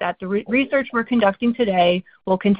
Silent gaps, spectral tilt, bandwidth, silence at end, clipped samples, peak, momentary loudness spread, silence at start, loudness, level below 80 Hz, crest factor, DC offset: none; -11 dB/octave; 5 kHz; 0 s; under 0.1%; -2 dBFS; 6 LU; 0 s; -20 LUFS; -54 dBFS; 18 dB; under 0.1%